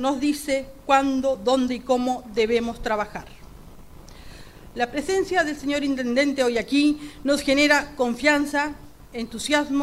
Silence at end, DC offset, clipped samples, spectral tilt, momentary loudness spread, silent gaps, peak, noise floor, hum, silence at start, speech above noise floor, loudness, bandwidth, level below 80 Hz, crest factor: 0 s; under 0.1%; under 0.1%; -3.5 dB/octave; 10 LU; none; -4 dBFS; -43 dBFS; none; 0 s; 20 dB; -23 LUFS; 15.5 kHz; -46 dBFS; 18 dB